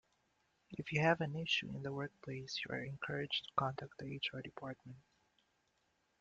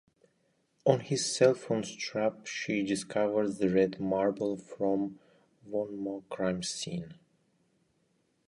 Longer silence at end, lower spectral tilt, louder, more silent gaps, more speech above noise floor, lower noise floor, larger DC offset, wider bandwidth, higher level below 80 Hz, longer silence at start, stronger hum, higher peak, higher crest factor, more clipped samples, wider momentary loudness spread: second, 1.2 s vs 1.35 s; about the same, -5 dB/octave vs -5 dB/octave; second, -40 LUFS vs -31 LUFS; neither; second, 39 dB vs 43 dB; first, -80 dBFS vs -73 dBFS; neither; second, 7.8 kHz vs 11.5 kHz; second, -74 dBFS vs -68 dBFS; second, 0.7 s vs 0.85 s; neither; second, -18 dBFS vs -8 dBFS; about the same, 24 dB vs 24 dB; neither; first, 15 LU vs 11 LU